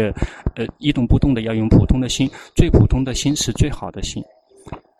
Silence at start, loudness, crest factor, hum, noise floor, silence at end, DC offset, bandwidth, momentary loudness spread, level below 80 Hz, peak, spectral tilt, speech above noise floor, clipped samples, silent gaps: 0 s; -18 LUFS; 18 dB; none; -38 dBFS; 0.2 s; under 0.1%; 13.5 kHz; 13 LU; -24 dBFS; 0 dBFS; -6 dB/octave; 20 dB; under 0.1%; none